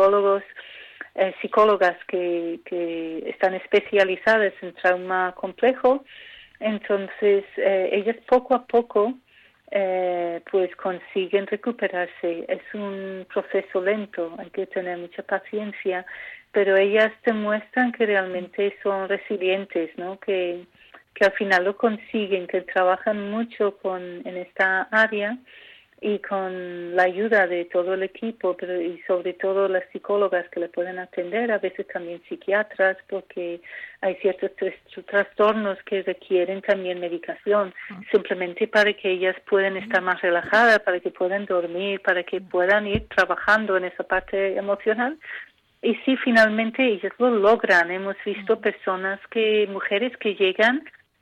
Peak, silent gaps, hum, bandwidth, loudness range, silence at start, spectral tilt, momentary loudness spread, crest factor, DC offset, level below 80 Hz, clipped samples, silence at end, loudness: -6 dBFS; none; none; 9.6 kHz; 5 LU; 0 s; -5.5 dB/octave; 12 LU; 16 dB; under 0.1%; -58 dBFS; under 0.1%; 0.35 s; -23 LUFS